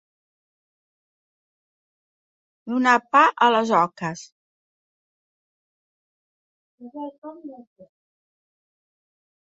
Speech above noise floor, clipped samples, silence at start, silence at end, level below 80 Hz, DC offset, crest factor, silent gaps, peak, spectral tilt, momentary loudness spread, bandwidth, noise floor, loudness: over 69 dB; under 0.1%; 2.65 s; 1.95 s; -76 dBFS; under 0.1%; 24 dB; 4.32-6.78 s, 7.18-7.22 s; -2 dBFS; -4.5 dB/octave; 24 LU; 8 kHz; under -90 dBFS; -19 LUFS